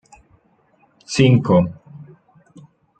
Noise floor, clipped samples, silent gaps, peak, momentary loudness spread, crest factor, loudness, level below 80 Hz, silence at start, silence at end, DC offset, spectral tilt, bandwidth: -58 dBFS; under 0.1%; none; -2 dBFS; 14 LU; 18 dB; -16 LUFS; -52 dBFS; 1.1 s; 0.95 s; under 0.1%; -6.5 dB/octave; 9.2 kHz